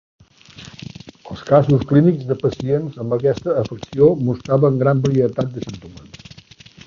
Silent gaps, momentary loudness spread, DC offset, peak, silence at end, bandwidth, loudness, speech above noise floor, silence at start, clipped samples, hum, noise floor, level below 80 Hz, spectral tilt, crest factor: none; 21 LU; under 0.1%; -2 dBFS; 0.7 s; 7.2 kHz; -17 LUFS; 27 dB; 0.6 s; under 0.1%; none; -44 dBFS; -48 dBFS; -8.5 dB/octave; 18 dB